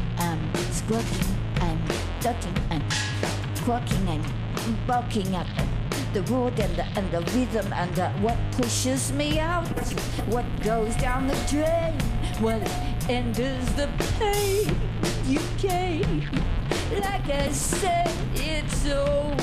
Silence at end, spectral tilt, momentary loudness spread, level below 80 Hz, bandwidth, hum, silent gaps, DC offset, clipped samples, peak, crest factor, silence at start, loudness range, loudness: 0 s; -5 dB/octave; 4 LU; -32 dBFS; 15.5 kHz; none; none; under 0.1%; under 0.1%; -10 dBFS; 14 dB; 0 s; 1 LU; -26 LUFS